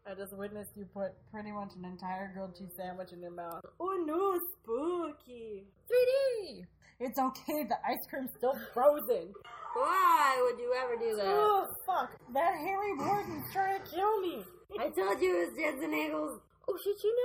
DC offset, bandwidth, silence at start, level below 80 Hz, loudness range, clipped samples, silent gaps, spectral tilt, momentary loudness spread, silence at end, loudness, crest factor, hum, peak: under 0.1%; 17 kHz; 0.05 s; -70 dBFS; 8 LU; under 0.1%; none; -4.5 dB/octave; 17 LU; 0 s; -33 LUFS; 20 dB; none; -14 dBFS